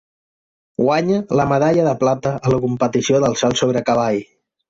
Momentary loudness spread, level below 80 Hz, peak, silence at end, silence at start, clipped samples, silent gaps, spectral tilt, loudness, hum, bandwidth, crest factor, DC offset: 4 LU; -50 dBFS; -4 dBFS; 0.45 s; 0.8 s; under 0.1%; none; -5.5 dB/octave; -17 LUFS; none; 7.8 kHz; 14 dB; under 0.1%